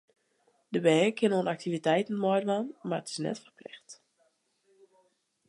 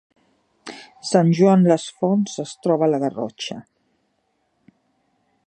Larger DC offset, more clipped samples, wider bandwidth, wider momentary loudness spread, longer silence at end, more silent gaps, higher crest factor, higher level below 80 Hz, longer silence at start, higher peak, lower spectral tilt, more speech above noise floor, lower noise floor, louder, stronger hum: neither; neither; first, 11.5 kHz vs 9.4 kHz; about the same, 21 LU vs 23 LU; second, 1.55 s vs 1.85 s; neither; about the same, 20 dB vs 20 dB; second, -82 dBFS vs -70 dBFS; about the same, 0.7 s vs 0.65 s; second, -12 dBFS vs -2 dBFS; about the same, -5.5 dB/octave vs -6.5 dB/octave; second, 44 dB vs 51 dB; about the same, -72 dBFS vs -69 dBFS; second, -29 LUFS vs -19 LUFS; neither